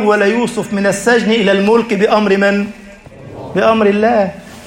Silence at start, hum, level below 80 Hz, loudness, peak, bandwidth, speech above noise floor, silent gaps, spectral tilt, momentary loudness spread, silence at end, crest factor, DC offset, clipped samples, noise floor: 0 s; none; -48 dBFS; -13 LUFS; 0 dBFS; 16 kHz; 22 dB; none; -5 dB/octave; 9 LU; 0 s; 12 dB; under 0.1%; under 0.1%; -34 dBFS